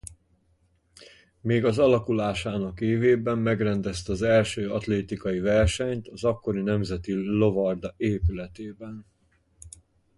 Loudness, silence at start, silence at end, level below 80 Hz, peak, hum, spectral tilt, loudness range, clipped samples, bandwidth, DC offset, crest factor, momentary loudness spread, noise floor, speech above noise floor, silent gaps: -25 LUFS; 0.05 s; 0.5 s; -42 dBFS; -10 dBFS; none; -6.5 dB/octave; 4 LU; under 0.1%; 11.5 kHz; under 0.1%; 16 dB; 14 LU; -66 dBFS; 41 dB; none